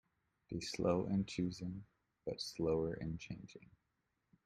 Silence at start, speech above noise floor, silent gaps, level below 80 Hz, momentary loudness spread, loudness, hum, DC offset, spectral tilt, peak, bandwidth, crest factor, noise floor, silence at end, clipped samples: 0.5 s; 45 dB; none; -64 dBFS; 15 LU; -41 LUFS; none; under 0.1%; -6 dB/octave; -20 dBFS; 13 kHz; 20 dB; -85 dBFS; 0.8 s; under 0.1%